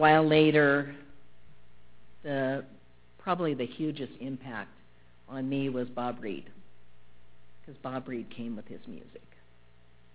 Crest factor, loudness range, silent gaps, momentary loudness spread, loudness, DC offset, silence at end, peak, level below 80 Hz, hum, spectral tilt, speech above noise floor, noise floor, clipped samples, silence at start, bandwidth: 24 dB; 13 LU; none; 23 LU; -30 LUFS; 0.3%; 0.95 s; -8 dBFS; -64 dBFS; 60 Hz at -65 dBFS; -4.5 dB/octave; 33 dB; -62 dBFS; under 0.1%; 0 s; 4 kHz